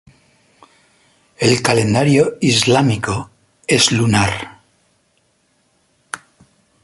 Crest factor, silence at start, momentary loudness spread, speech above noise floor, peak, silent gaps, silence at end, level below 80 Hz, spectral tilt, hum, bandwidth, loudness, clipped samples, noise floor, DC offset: 18 dB; 1.4 s; 19 LU; 47 dB; 0 dBFS; none; 0.65 s; -46 dBFS; -4.5 dB/octave; none; 11.5 kHz; -15 LUFS; under 0.1%; -61 dBFS; under 0.1%